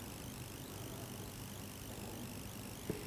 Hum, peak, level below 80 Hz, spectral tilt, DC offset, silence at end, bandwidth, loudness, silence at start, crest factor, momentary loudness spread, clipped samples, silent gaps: none; -28 dBFS; -58 dBFS; -4.5 dB/octave; under 0.1%; 0 s; 16 kHz; -47 LUFS; 0 s; 20 dB; 1 LU; under 0.1%; none